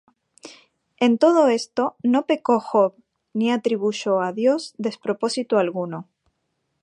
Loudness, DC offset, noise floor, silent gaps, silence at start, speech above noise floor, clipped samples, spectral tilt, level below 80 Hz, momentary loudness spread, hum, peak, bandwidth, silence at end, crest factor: -21 LUFS; under 0.1%; -74 dBFS; none; 0.45 s; 54 dB; under 0.1%; -5 dB/octave; -76 dBFS; 10 LU; none; -4 dBFS; 11 kHz; 0.8 s; 18 dB